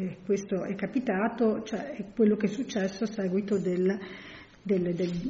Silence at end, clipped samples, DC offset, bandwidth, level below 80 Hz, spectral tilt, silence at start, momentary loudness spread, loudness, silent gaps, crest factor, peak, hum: 0 s; under 0.1%; under 0.1%; 7.6 kHz; -60 dBFS; -6.5 dB/octave; 0 s; 10 LU; -29 LUFS; none; 16 dB; -14 dBFS; none